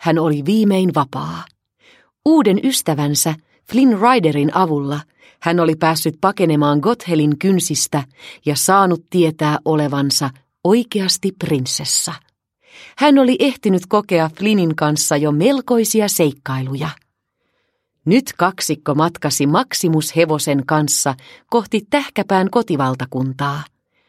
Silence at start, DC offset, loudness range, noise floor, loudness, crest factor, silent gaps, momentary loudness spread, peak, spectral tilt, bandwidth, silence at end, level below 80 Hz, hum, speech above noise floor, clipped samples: 0 s; under 0.1%; 3 LU; -70 dBFS; -16 LUFS; 16 dB; none; 9 LU; 0 dBFS; -4.5 dB/octave; 16 kHz; 0.45 s; -60 dBFS; none; 54 dB; under 0.1%